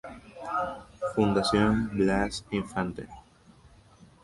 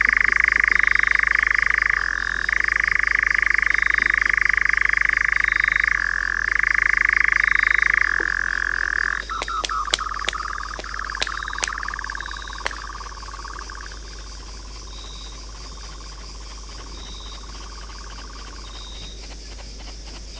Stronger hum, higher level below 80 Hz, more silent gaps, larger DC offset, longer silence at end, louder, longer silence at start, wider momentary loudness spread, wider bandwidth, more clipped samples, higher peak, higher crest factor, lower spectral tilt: neither; second, -48 dBFS vs -38 dBFS; neither; neither; first, 1.05 s vs 0 s; second, -28 LUFS vs -19 LUFS; about the same, 0.05 s vs 0 s; second, 18 LU vs 21 LU; first, 11.5 kHz vs 8 kHz; neither; second, -10 dBFS vs 0 dBFS; about the same, 18 dB vs 22 dB; first, -6 dB/octave vs -1.5 dB/octave